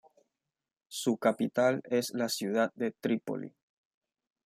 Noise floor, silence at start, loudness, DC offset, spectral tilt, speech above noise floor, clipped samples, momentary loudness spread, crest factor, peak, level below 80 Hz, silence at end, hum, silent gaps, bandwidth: under -90 dBFS; 0.9 s; -31 LUFS; under 0.1%; -4.5 dB/octave; over 60 dB; under 0.1%; 11 LU; 20 dB; -14 dBFS; -80 dBFS; 0.95 s; none; none; 15.5 kHz